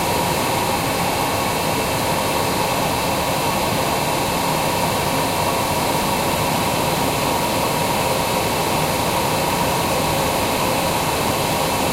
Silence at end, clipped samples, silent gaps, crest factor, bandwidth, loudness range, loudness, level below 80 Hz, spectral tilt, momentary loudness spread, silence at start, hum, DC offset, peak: 0 s; under 0.1%; none; 14 dB; 16 kHz; 0 LU; -19 LUFS; -38 dBFS; -3.5 dB/octave; 1 LU; 0 s; none; under 0.1%; -6 dBFS